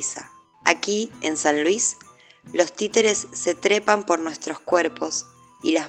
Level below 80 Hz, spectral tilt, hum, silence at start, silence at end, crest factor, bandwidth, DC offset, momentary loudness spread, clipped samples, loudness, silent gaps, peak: -68 dBFS; -2 dB/octave; none; 0 s; 0 s; 24 dB; 10.5 kHz; under 0.1%; 9 LU; under 0.1%; -22 LUFS; none; 0 dBFS